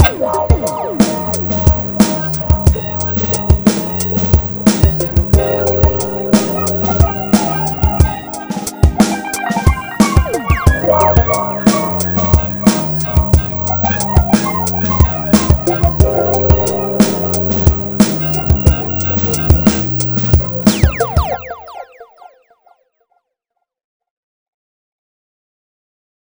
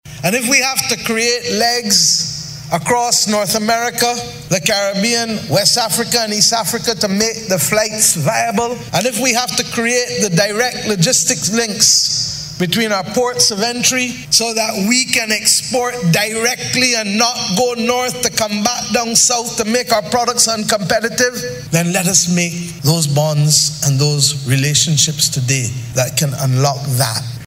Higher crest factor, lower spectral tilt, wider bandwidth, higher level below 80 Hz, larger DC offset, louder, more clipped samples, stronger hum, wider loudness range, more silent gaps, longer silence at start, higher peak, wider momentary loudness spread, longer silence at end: about the same, 14 dB vs 16 dB; first, -6 dB/octave vs -2.5 dB/octave; first, over 20 kHz vs 16.5 kHz; first, -20 dBFS vs -48 dBFS; neither; about the same, -13 LUFS vs -14 LUFS; neither; neither; about the same, 2 LU vs 1 LU; neither; about the same, 0 s vs 0.05 s; about the same, 0 dBFS vs 0 dBFS; about the same, 4 LU vs 6 LU; first, 4.05 s vs 0 s